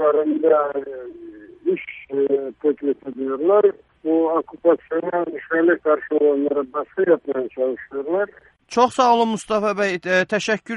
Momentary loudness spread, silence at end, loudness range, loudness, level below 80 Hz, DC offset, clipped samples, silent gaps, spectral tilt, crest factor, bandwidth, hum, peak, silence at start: 11 LU; 0 s; 2 LU; -20 LUFS; -64 dBFS; under 0.1%; under 0.1%; none; -5 dB/octave; 16 dB; 11.5 kHz; none; -4 dBFS; 0 s